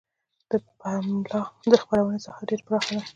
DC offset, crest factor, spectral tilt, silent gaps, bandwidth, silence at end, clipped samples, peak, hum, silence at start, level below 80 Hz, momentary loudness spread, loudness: under 0.1%; 24 dB; -6 dB/octave; none; 9 kHz; 0.05 s; under 0.1%; -2 dBFS; none; 0.5 s; -62 dBFS; 11 LU; -26 LUFS